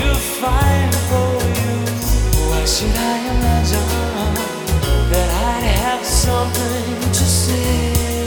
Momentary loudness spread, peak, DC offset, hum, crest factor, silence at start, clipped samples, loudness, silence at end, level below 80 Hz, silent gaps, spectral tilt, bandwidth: 4 LU; -2 dBFS; under 0.1%; none; 14 dB; 0 s; under 0.1%; -17 LUFS; 0 s; -20 dBFS; none; -4.5 dB/octave; over 20 kHz